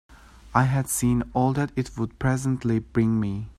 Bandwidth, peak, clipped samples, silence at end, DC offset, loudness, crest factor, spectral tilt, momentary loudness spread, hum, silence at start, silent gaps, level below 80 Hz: 13.5 kHz; -2 dBFS; under 0.1%; 0.05 s; under 0.1%; -25 LUFS; 22 dB; -6.5 dB/octave; 5 LU; none; 0.1 s; none; -44 dBFS